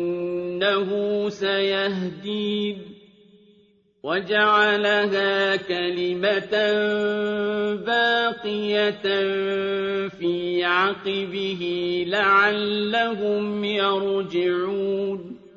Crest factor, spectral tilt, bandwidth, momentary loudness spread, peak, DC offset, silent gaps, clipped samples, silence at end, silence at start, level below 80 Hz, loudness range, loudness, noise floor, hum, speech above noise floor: 16 dB; -5.5 dB/octave; 7.4 kHz; 9 LU; -6 dBFS; under 0.1%; none; under 0.1%; 0.1 s; 0 s; -66 dBFS; 4 LU; -22 LUFS; -59 dBFS; none; 37 dB